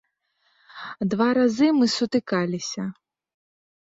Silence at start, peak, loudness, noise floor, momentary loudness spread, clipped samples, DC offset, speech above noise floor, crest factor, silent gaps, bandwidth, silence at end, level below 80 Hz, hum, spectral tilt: 0.75 s; -8 dBFS; -23 LUFS; -69 dBFS; 14 LU; under 0.1%; under 0.1%; 48 dB; 16 dB; none; 7.8 kHz; 1 s; -66 dBFS; none; -5 dB/octave